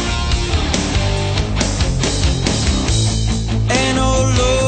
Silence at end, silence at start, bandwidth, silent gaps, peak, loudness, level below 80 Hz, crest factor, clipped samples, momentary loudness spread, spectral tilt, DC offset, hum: 0 s; 0 s; 9.2 kHz; none; -2 dBFS; -17 LUFS; -20 dBFS; 14 dB; under 0.1%; 4 LU; -4.5 dB/octave; under 0.1%; none